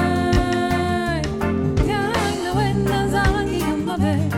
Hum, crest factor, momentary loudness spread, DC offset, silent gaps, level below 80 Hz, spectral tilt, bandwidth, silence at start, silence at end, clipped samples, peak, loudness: none; 14 dB; 3 LU; under 0.1%; none; -30 dBFS; -6 dB/octave; 17 kHz; 0 s; 0 s; under 0.1%; -6 dBFS; -20 LUFS